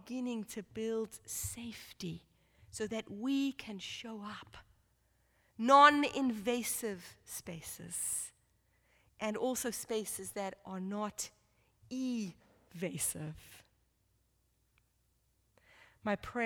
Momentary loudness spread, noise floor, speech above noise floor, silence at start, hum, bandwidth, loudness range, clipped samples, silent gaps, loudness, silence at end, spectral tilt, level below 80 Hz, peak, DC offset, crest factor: 12 LU; -76 dBFS; 40 dB; 0.05 s; none; over 20 kHz; 12 LU; under 0.1%; none; -35 LUFS; 0 s; -3 dB/octave; -68 dBFS; -10 dBFS; under 0.1%; 26 dB